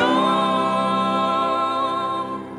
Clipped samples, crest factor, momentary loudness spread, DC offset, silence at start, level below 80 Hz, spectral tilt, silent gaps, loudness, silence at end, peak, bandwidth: under 0.1%; 14 dB; 6 LU; under 0.1%; 0 s; -62 dBFS; -5.5 dB/octave; none; -20 LUFS; 0 s; -6 dBFS; 11.5 kHz